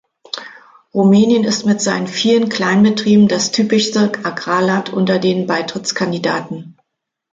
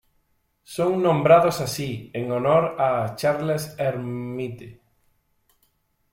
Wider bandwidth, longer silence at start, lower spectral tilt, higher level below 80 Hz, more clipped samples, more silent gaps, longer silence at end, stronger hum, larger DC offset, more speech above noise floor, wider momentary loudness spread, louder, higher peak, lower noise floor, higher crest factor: second, 7.8 kHz vs 16.5 kHz; second, 0.35 s vs 0.7 s; about the same, -5 dB/octave vs -6 dB/octave; about the same, -60 dBFS vs -60 dBFS; neither; neither; second, 0.6 s vs 1.4 s; neither; neither; first, 62 dB vs 46 dB; second, 12 LU vs 15 LU; first, -15 LUFS vs -22 LUFS; about the same, -2 dBFS vs -4 dBFS; first, -76 dBFS vs -68 dBFS; second, 14 dB vs 20 dB